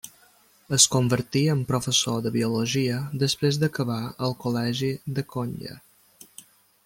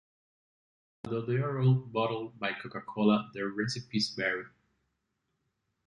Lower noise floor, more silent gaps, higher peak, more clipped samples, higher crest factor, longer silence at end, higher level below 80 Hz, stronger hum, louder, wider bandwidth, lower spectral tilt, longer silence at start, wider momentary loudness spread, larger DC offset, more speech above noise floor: second, -58 dBFS vs -81 dBFS; neither; first, -2 dBFS vs -12 dBFS; neither; about the same, 24 dB vs 20 dB; second, 1.05 s vs 1.4 s; first, -60 dBFS vs -68 dBFS; neither; first, -24 LUFS vs -31 LUFS; first, 17 kHz vs 10.5 kHz; second, -4 dB/octave vs -6 dB/octave; second, 0.05 s vs 1.05 s; about the same, 13 LU vs 11 LU; neither; second, 34 dB vs 50 dB